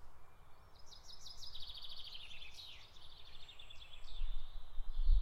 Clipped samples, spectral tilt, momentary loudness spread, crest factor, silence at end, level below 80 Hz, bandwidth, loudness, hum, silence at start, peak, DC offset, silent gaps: under 0.1%; -3 dB/octave; 15 LU; 18 dB; 0 s; -42 dBFS; 7.4 kHz; -51 LUFS; none; 0 s; -20 dBFS; under 0.1%; none